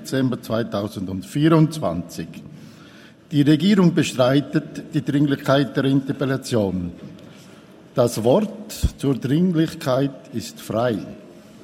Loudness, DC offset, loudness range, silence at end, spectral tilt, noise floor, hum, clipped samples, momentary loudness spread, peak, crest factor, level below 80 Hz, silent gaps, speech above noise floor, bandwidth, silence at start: -21 LUFS; under 0.1%; 4 LU; 0.25 s; -6.5 dB/octave; -45 dBFS; none; under 0.1%; 15 LU; -2 dBFS; 18 dB; -42 dBFS; none; 25 dB; 16 kHz; 0 s